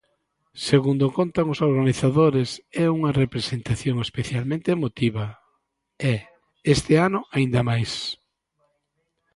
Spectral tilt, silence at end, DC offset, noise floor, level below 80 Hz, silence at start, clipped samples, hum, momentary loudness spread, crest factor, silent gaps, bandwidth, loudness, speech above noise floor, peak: -6.5 dB/octave; 1.2 s; under 0.1%; -75 dBFS; -50 dBFS; 0.55 s; under 0.1%; none; 10 LU; 18 dB; none; 11.5 kHz; -23 LUFS; 53 dB; -4 dBFS